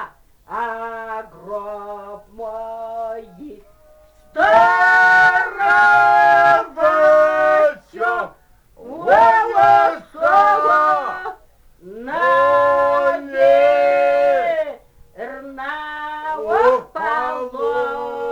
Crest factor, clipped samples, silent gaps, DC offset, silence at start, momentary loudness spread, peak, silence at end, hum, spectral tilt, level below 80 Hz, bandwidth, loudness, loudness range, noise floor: 16 dB; under 0.1%; none; under 0.1%; 0 s; 19 LU; -2 dBFS; 0 s; none; -4 dB/octave; -54 dBFS; 11.5 kHz; -15 LUFS; 12 LU; -49 dBFS